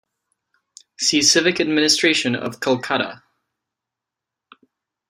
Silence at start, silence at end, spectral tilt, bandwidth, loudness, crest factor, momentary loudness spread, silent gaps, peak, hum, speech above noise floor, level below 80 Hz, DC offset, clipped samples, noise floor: 1 s; 1.95 s; -2 dB/octave; 15.5 kHz; -17 LUFS; 20 dB; 9 LU; none; -2 dBFS; none; 66 dB; -64 dBFS; under 0.1%; under 0.1%; -85 dBFS